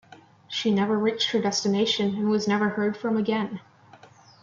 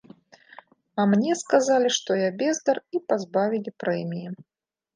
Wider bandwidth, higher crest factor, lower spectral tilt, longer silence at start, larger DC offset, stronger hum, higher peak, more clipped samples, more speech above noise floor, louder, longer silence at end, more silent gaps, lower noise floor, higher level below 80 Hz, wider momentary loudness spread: second, 7.6 kHz vs 10 kHz; second, 14 dB vs 20 dB; about the same, -4.5 dB/octave vs -4.5 dB/octave; second, 0.1 s vs 0.95 s; neither; neither; second, -12 dBFS vs -6 dBFS; neither; about the same, 28 dB vs 28 dB; about the same, -25 LUFS vs -24 LUFS; first, 0.8 s vs 0.55 s; neither; about the same, -52 dBFS vs -51 dBFS; first, -70 dBFS vs -78 dBFS; second, 5 LU vs 12 LU